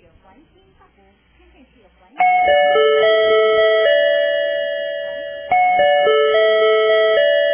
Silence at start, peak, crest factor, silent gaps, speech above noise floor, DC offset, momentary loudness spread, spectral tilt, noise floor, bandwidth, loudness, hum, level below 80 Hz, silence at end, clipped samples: 2.15 s; -6 dBFS; 10 dB; none; 37 dB; under 0.1%; 9 LU; -5 dB/octave; -54 dBFS; 3.5 kHz; -15 LUFS; none; -56 dBFS; 0 s; under 0.1%